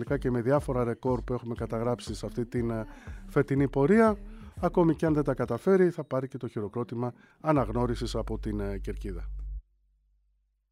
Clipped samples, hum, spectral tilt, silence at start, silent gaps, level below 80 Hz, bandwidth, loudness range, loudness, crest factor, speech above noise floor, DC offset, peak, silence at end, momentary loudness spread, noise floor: under 0.1%; none; -8 dB/octave; 0 s; none; -42 dBFS; 14 kHz; 6 LU; -29 LUFS; 18 dB; 44 dB; under 0.1%; -12 dBFS; 1.1 s; 14 LU; -72 dBFS